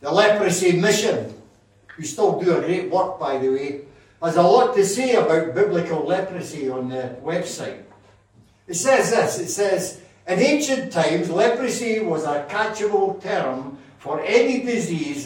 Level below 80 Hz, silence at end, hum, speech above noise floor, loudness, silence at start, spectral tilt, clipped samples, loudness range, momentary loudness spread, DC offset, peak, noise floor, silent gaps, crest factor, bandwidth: -64 dBFS; 0 s; none; 35 dB; -21 LUFS; 0 s; -4.5 dB/octave; under 0.1%; 4 LU; 12 LU; under 0.1%; -2 dBFS; -55 dBFS; none; 18 dB; 16.5 kHz